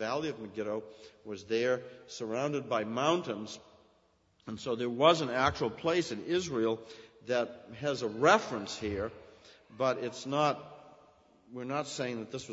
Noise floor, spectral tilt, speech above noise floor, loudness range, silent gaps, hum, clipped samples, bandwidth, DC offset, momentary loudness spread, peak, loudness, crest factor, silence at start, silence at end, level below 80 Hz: -69 dBFS; -4.5 dB/octave; 37 dB; 5 LU; none; none; under 0.1%; 8 kHz; under 0.1%; 19 LU; -10 dBFS; -32 LUFS; 24 dB; 0 s; 0 s; -64 dBFS